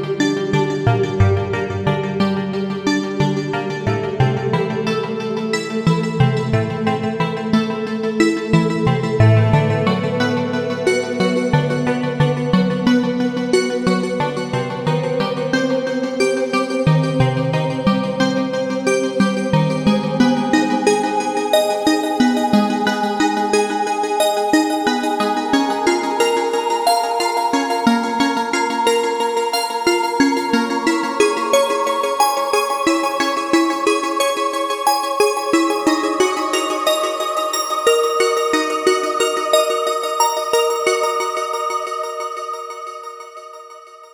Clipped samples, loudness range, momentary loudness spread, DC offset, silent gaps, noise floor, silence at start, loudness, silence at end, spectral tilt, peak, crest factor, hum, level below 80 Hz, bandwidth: under 0.1%; 3 LU; 5 LU; under 0.1%; none; -39 dBFS; 0 s; -18 LUFS; 0.05 s; -5 dB/octave; 0 dBFS; 16 dB; none; -46 dBFS; over 20 kHz